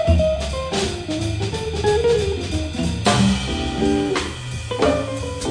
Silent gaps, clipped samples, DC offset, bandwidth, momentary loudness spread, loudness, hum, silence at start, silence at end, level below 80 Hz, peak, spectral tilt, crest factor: none; under 0.1%; under 0.1%; 10 kHz; 7 LU; -21 LUFS; none; 0 s; 0 s; -30 dBFS; -4 dBFS; -5.5 dB/octave; 16 dB